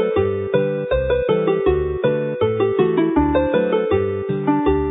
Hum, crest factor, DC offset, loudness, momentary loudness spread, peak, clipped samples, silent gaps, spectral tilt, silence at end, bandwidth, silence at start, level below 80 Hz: none; 14 dB; under 0.1%; -19 LUFS; 3 LU; -4 dBFS; under 0.1%; none; -12.5 dB/octave; 0 s; 4 kHz; 0 s; -34 dBFS